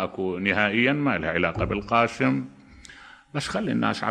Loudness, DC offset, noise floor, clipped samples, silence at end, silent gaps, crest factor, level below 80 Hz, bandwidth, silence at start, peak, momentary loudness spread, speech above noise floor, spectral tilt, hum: -24 LUFS; under 0.1%; -47 dBFS; under 0.1%; 0 s; none; 20 dB; -48 dBFS; 10.5 kHz; 0 s; -6 dBFS; 10 LU; 23 dB; -6 dB/octave; none